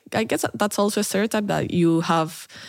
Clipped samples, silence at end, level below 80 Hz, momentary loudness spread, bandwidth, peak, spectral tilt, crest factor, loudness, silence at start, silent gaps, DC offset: under 0.1%; 0 s; -62 dBFS; 4 LU; 17 kHz; -6 dBFS; -5 dB/octave; 16 dB; -22 LUFS; 0.1 s; none; under 0.1%